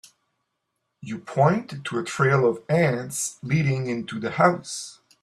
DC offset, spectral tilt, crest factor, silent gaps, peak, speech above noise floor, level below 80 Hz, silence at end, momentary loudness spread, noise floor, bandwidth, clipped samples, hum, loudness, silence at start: under 0.1%; -5.5 dB/octave; 20 dB; none; -4 dBFS; 55 dB; -62 dBFS; 0.3 s; 13 LU; -78 dBFS; 13.5 kHz; under 0.1%; none; -24 LUFS; 1.05 s